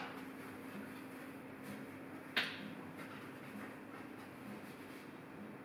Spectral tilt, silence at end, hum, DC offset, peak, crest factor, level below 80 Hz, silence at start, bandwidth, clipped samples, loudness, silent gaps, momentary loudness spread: -4.5 dB/octave; 0 s; none; under 0.1%; -22 dBFS; 26 dB; -82 dBFS; 0 s; over 20 kHz; under 0.1%; -47 LUFS; none; 12 LU